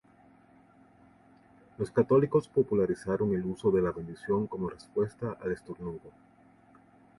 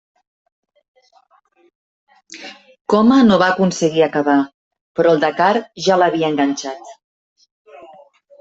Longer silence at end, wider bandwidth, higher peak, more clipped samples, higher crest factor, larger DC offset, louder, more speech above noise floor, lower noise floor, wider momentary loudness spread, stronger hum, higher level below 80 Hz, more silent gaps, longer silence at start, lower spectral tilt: second, 1.1 s vs 1.5 s; first, 11.5 kHz vs 8 kHz; second, -12 dBFS vs -2 dBFS; neither; about the same, 18 dB vs 16 dB; neither; second, -30 LUFS vs -15 LUFS; second, 31 dB vs 41 dB; first, -60 dBFS vs -56 dBFS; second, 14 LU vs 22 LU; neither; about the same, -60 dBFS vs -58 dBFS; second, none vs 2.81-2.85 s, 4.54-4.71 s, 4.81-4.95 s; second, 1.8 s vs 2.35 s; first, -8.5 dB/octave vs -5.5 dB/octave